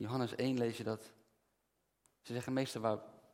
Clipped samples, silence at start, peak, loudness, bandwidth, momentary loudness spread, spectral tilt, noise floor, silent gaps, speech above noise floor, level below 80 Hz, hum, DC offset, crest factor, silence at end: under 0.1%; 0 s; -20 dBFS; -39 LUFS; 16.5 kHz; 8 LU; -6 dB/octave; -82 dBFS; none; 44 dB; -82 dBFS; none; under 0.1%; 20 dB; 0.2 s